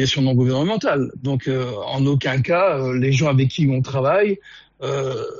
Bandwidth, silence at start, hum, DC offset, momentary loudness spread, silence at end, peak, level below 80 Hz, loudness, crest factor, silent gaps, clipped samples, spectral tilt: 7.4 kHz; 0 s; none; under 0.1%; 7 LU; 0 s; -8 dBFS; -52 dBFS; -19 LUFS; 12 dB; none; under 0.1%; -5.5 dB/octave